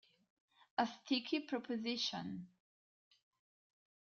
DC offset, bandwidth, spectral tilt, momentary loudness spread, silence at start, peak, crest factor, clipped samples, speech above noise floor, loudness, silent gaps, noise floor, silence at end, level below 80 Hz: under 0.1%; 7.2 kHz; -2 dB/octave; 11 LU; 0.8 s; -20 dBFS; 22 dB; under 0.1%; over 49 dB; -40 LUFS; none; under -90 dBFS; 1.6 s; -86 dBFS